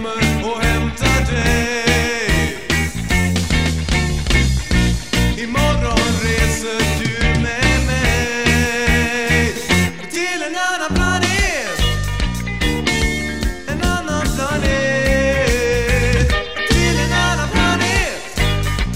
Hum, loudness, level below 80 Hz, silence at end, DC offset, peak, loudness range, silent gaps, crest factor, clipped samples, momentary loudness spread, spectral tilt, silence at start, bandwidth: none; -17 LUFS; -22 dBFS; 0 s; 2%; -2 dBFS; 2 LU; none; 14 dB; under 0.1%; 4 LU; -4.5 dB/octave; 0 s; 16 kHz